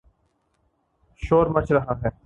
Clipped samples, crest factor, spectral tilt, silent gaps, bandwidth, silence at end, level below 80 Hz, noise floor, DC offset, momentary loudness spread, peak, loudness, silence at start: under 0.1%; 20 dB; -9 dB/octave; none; 8 kHz; 0.15 s; -42 dBFS; -69 dBFS; under 0.1%; 9 LU; -4 dBFS; -21 LUFS; 1.2 s